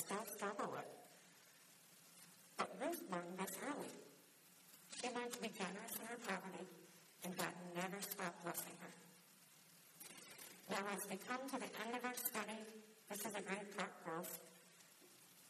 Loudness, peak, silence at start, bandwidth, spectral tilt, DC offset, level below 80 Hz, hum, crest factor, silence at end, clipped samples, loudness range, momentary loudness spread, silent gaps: -48 LUFS; -26 dBFS; 0 s; 14 kHz; -3 dB/octave; under 0.1%; under -90 dBFS; none; 24 dB; 0 s; under 0.1%; 3 LU; 19 LU; none